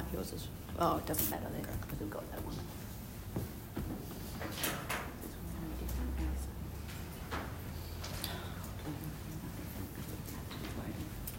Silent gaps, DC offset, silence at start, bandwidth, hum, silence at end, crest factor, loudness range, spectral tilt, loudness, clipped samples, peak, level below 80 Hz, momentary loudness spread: none; under 0.1%; 0 s; 16.5 kHz; none; 0 s; 24 dB; 5 LU; -5 dB/octave; -41 LUFS; under 0.1%; -16 dBFS; -48 dBFS; 10 LU